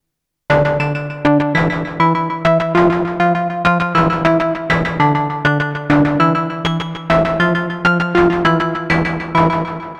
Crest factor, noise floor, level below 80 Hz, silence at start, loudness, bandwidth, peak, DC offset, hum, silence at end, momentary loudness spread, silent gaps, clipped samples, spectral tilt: 16 dB; -38 dBFS; -38 dBFS; 0.5 s; -15 LUFS; 8.8 kHz; 0 dBFS; under 0.1%; none; 0 s; 5 LU; none; under 0.1%; -7.5 dB/octave